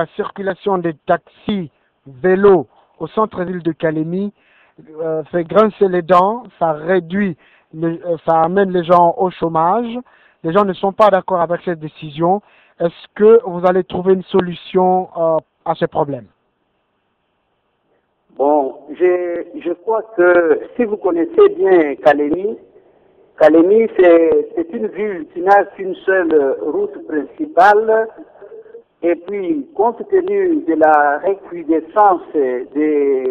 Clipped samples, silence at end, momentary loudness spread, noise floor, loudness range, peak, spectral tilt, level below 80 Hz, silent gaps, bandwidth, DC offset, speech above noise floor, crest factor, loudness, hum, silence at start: under 0.1%; 0 s; 12 LU; -66 dBFS; 6 LU; 0 dBFS; -8.5 dB/octave; -56 dBFS; none; 6 kHz; under 0.1%; 51 dB; 16 dB; -15 LUFS; none; 0 s